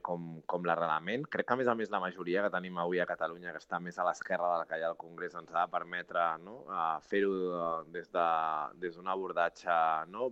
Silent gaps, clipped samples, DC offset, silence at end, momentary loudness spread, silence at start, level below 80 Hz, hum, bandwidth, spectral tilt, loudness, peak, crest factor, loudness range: none; under 0.1%; under 0.1%; 0 s; 8 LU; 0.05 s; -76 dBFS; none; 8.2 kHz; -6 dB/octave; -34 LUFS; -14 dBFS; 20 dB; 2 LU